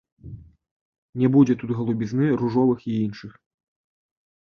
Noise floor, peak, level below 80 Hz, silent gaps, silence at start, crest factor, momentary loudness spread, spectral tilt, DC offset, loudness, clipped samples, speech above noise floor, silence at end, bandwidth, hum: -42 dBFS; -6 dBFS; -56 dBFS; 0.71-1.13 s; 0.25 s; 18 dB; 23 LU; -9 dB/octave; under 0.1%; -22 LUFS; under 0.1%; 21 dB; 1.1 s; 6.6 kHz; none